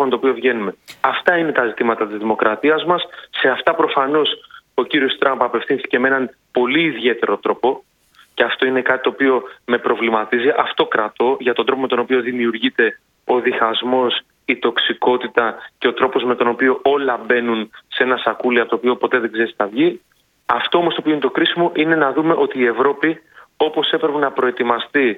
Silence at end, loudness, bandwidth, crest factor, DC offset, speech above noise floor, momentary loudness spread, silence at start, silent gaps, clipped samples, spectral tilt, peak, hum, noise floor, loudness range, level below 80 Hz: 0 s; -17 LUFS; 5.2 kHz; 18 dB; under 0.1%; 29 dB; 5 LU; 0 s; none; under 0.1%; -6 dB/octave; 0 dBFS; none; -46 dBFS; 1 LU; -66 dBFS